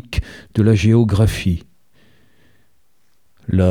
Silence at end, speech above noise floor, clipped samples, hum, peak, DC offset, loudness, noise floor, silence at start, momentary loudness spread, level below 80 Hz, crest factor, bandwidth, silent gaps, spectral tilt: 0 s; 51 dB; under 0.1%; none; -2 dBFS; 0.3%; -17 LUFS; -65 dBFS; 0.1 s; 13 LU; -34 dBFS; 16 dB; 15 kHz; none; -7.5 dB/octave